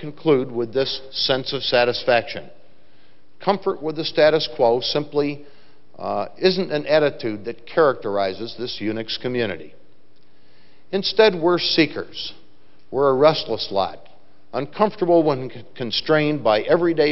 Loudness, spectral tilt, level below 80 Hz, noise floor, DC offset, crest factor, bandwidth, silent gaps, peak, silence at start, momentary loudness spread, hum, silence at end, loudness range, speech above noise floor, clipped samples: -20 LUFS; -3 dB/octave; -56 dBFS; -59 dBFS; 1%; 20 dB; 6 kHz; none; 0 dBFS; 0 s; 12 LU; none; 0 s; 4 LU; 38 dB; under 0.1%